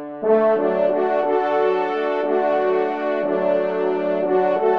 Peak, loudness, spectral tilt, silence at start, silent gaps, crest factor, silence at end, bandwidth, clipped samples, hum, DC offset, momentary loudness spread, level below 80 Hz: -6 dBFS; -20 LUFS; -7.5 dB/octave; 0 s; none; 14 dB; 0 s; 6 kHz; under 0.1%; none; 0.3%; 4 LU; -72 dBFS